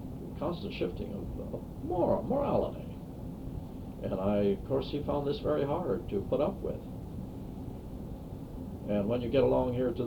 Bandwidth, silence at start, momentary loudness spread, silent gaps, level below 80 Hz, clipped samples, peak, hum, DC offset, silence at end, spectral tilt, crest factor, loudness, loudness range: over 20 kHz; 0 s; 13 LU; none; -46 dBFS; under 0.1%; -14 dBFS; none; under 0.1%; 0 s; -8.5 dB/octave; 18 dB; -34 LUFS; 4 LU